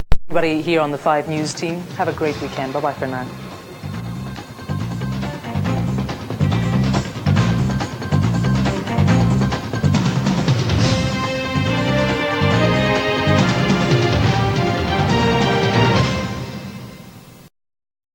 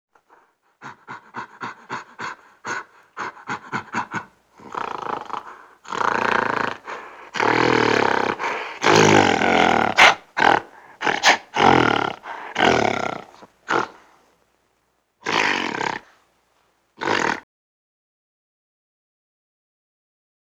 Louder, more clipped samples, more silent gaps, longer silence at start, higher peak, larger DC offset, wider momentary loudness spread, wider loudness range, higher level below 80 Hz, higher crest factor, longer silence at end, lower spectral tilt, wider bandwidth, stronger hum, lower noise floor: about the same, -19 LUFS vs -19 LUFS; neither; neither; second, 0 s vs 0.8 s; about the same, 0 dBFS vs -2 dBFS; neither; second, 12 LU vs 19 LU; second, 8 LU vs 15 LU; first, -34 dBFS vs -58 dBFS; about the same, 18 dB vs 22 dB; second, 0.65 s vs 3.05 s; first, -6 dB/octave vs -3.5 dB/octave; second, 17 kHz vs 19.5 kHz; neither; second, -40 dBFS vs -68 dBFS